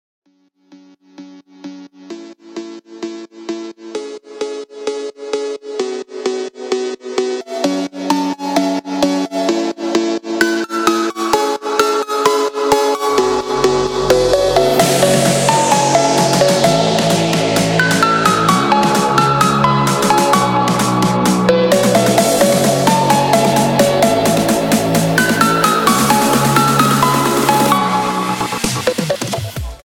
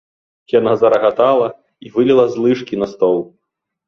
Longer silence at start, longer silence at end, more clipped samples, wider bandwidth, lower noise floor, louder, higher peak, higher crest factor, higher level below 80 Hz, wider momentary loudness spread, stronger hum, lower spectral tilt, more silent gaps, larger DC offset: first, 0.7 s vs 0.55 s; second, 0.1 s vs 0.65 s; neither; first, 19.5 kHz vs 6.8 kHz; second, -57 dBFS vs -77 dBFS; about the same, -14 LUFS vs -15 LUFS; about the same, -2 dBFS vs -2 dBFS; about the same, 12 dB vs 14 dB; first, -42 dBFS vs -58 dBFS; first, 14 LU vs 9 LU; neither; second, -4 dB/octave vs -7 dB/octave; neither; neither